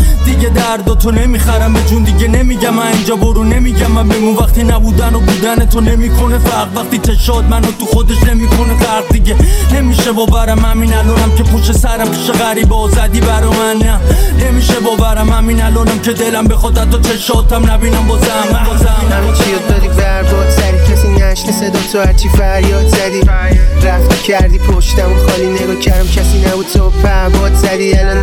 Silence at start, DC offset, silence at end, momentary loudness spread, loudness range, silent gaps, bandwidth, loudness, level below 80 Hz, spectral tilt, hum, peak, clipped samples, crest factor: 0 s; 0.5%; 0 s; 2 LU; 1 LU; none; 16.5 kHz; -11 LUFS; -10 dBFS; -5.5 dB/octave; none; 0 dBFS; under 0.1%; 8 dB